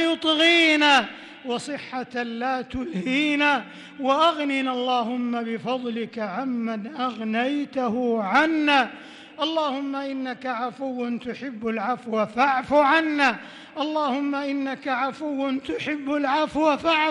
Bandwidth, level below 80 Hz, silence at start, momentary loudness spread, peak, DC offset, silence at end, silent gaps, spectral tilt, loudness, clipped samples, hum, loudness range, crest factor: 11.5 kHz; -60 dBFS; 0 s; 12 LU; -8 dBFS; under 0.1%; 0 s; none; -4 dB/octave; -23 LUFS; under 0.1%; none; 4 LU; 16 dB